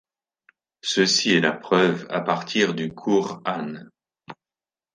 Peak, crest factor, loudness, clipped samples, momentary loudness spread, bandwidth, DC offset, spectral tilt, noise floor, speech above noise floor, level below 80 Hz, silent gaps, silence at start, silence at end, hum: -4 dBFS; 20 dB; -22 LUFS; under 0.1%; 12 LU; 10 kHz; under 0.1%; -4 dB/octave; under -90 dBFS; over 68 dB; -70 dBFS; none; 0.85 s; 0.6 s; none